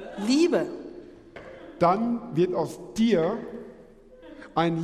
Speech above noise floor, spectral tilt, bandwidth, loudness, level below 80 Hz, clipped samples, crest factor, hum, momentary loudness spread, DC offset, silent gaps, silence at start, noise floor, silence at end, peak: 26 dB; -6 dB/octave; 13 kHz; -25 LUFS; -58 dBFS; under 0.1%; 18 dB; none; 23 LU; under 0.1%; none; 0 s; -50 dBFS; 0 s; -8 dBFS